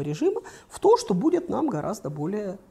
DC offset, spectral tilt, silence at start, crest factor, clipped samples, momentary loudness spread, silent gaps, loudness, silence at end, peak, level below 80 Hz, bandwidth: under 0.1%; -6.5 dB/octave; 0 s; 18 dB; under 0.1%; 11 LU; none; -25 LUFS; 0.15 s; -8 dBFS; -60 dBFS; 14 kHz